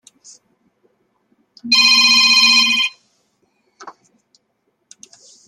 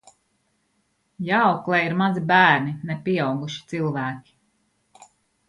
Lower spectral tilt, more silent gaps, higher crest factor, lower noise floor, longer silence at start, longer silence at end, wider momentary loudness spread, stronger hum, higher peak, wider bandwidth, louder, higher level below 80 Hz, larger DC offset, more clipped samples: second, 2 dB/octave vs -6.5 dB/octave; neither; about the same, 18 dB vs 22 dB; about the same, -68 dBFS vs -69 dBFS; first, 1.65 s vs 1.2 s; first, 1.55 s vs 1.3 s; second, 10 LU vs 14 LU; neither; about the same, 0 dBFS vs -2 dBFS; first, 12.5 kHz vs 11 kHz; first, -10 LUFS vs -21 LUFS; about the same, -68 dBFS vs -66 dBFS; neither; neither